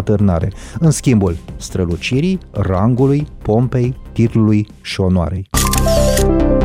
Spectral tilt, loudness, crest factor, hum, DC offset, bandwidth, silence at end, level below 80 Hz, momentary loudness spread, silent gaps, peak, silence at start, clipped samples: -6 dB/octave; -15 LUFS; 12 dB; none; under 0.1%; 16 kHz; 0 s; -24 dBFS; 6 LU; none; -2 dBFS; 0 s; under 0.1%